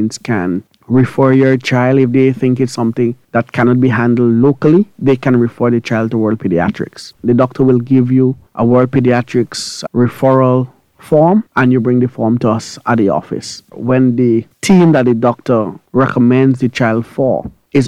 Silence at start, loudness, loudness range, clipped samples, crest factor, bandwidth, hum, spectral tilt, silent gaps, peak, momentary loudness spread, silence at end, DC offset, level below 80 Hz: 0 s; -13 LUFS; 2 LU; under 0.1%; 12 dB; 12 kHz; none; -7.5 dB/octave; none; 0 dBFS; 8 LU; 0 s; under 0.1%; -48 dBFS